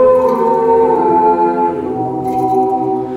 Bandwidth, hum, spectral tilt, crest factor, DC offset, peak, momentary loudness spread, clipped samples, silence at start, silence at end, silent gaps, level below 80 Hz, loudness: 13.5 kHz; none; -8.5 dB/octave; 10 dB; under 0.1%; -2 dBFS; 7 LU; under 0.1%; 0 s; 0 s; none; -50 dBFS; -13 LUFS